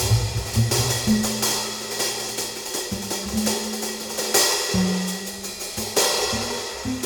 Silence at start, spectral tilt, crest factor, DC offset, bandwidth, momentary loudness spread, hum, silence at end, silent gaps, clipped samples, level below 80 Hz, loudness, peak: 0 s; -3 dB/octave; 20 dB; under 0.1%; over 20 kHz; 8 LU; none; 0 s; none; under 0.1%; -40 dBFS; -23 LUFS; -4 dBFS